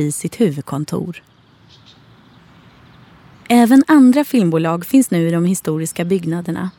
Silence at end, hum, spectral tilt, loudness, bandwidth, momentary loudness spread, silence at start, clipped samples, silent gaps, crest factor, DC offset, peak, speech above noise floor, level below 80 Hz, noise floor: 0.1 s; none; -6 dB/octave; -15 LUFS; 19 kHz; 13 LU; 0 s; under 0.1%; none; 14 dB; under 0.1%; -2 dBFS; 33 dB; -58 dBFS; -48 dBFS